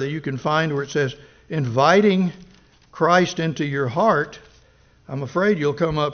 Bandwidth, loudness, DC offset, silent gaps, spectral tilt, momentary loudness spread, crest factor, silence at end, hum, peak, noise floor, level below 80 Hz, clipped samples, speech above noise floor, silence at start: 6.6 kHz; -20 LUFS; under 0.1%; none; -5 dB/octave; 10 LU; 18 dB; 0 s; none; -2 dBFS; -54 dBFS; -54 dBFS; under 0.1%; 34 dB; 0 s